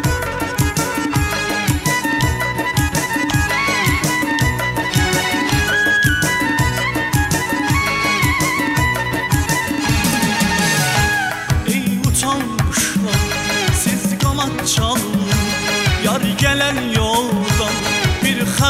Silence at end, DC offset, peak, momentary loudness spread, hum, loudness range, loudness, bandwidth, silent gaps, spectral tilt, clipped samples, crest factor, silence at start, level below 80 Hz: 0 s; under 0.1%; 0 dBFS; 4 LU; none; 1 LU; -16 LUFS; 16 kHz; none; -4 dB/octave; under 0.1%; 16 dB; 0 s; -30 dBFS